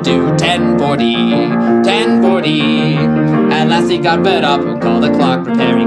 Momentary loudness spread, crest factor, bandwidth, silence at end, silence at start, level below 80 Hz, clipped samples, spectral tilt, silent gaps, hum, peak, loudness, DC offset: 2 LU; 12 dB; 10 kHz; 0 s; 0 s; -42 dBFS; under 0.1%; -6 dB/octave; none; none; 0 dBFS; -12 LUFS; under 0.1%